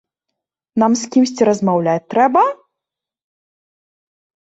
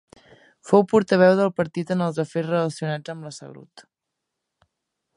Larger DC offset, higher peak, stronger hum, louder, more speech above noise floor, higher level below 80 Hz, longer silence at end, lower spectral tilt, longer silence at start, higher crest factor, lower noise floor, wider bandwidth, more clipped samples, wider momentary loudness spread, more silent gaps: neither; about the same, -2 dBFS vs -2 dBFS; neither; first, -16 LUFS vs -21 LUFS; first, 70 dB vs 61 dB; about the same, -62 dBFS vs -66 dBFS; first, 1.95 s vs 1.35 s; second, -5.5 dB/octave vs -7 dB/octave; about the same, 0.75 s vs 0.65 s; second, 16 dB vs 22 dB; about the same, -85 dBFS vs -82 dBFS; second, 8 kHz vs 11 kHz; neither; second, 5 LU vs 19 LU; neither